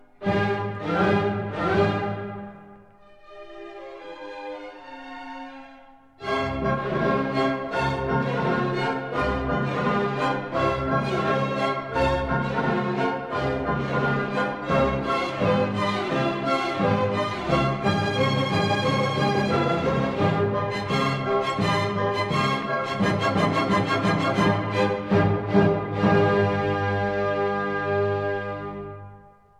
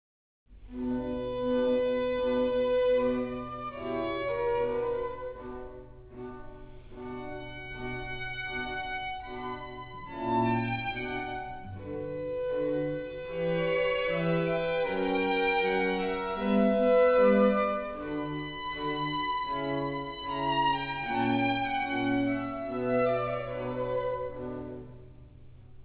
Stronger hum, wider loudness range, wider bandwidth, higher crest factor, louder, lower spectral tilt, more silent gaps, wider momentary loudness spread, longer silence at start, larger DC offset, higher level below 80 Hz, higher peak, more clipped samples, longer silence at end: neither; about the same, 8 LU vs 10 LU; first, 12 kHz vs 4 kHz; about the same, 18 dB vs 18 dB; first, -24 LUFS vs -30 LUFS; first, -6.5 dB/octave vs -4 dB/octave; neither; about the same, 14 LU vs 15 LU; second, 0.2 s vs 0.5 s; neither; first, -46 dBFS vs -52 dBFS; first, -8 dBFS vs -12 dBFS; neither; first, 0.4 s vs 0 s